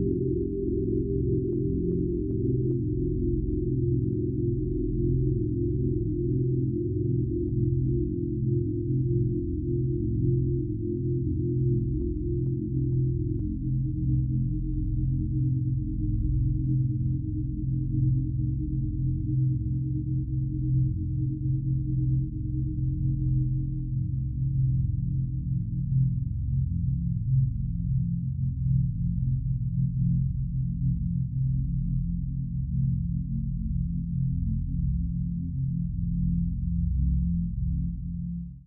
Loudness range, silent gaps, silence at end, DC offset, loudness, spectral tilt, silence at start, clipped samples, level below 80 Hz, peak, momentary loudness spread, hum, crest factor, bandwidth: 2 LU; none; 0.05 s; under 0.1%; -28 LUFS; -23 dB/octave; 0 s; under 0.1%; -34 dBFS; -14 dBFS; 4 LU; none; 12 dB; 0.5 kHz